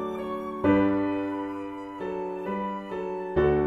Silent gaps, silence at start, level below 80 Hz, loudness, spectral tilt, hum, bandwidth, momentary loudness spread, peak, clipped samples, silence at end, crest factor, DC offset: none; 0 s; -48 dBFS; -28 LUFS; -8.5 dB/octave; none; 6 kHz; 11 LU; -10 dBFS; under 0.1%; 0 s; 18 dB; under 0.1%